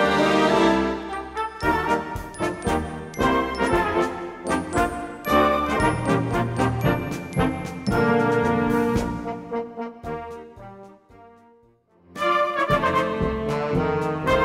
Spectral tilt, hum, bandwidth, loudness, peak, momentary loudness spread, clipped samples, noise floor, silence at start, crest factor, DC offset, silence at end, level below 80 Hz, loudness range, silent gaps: -6 dB/octave; none; 16 kHz; -23 LUFS; -6 dBFS; 13 LU; under 0.1%; -58 dBFS; 0 s; 18 dB; under 0.1%; 0 s; -40 dBFS; 6 LU; none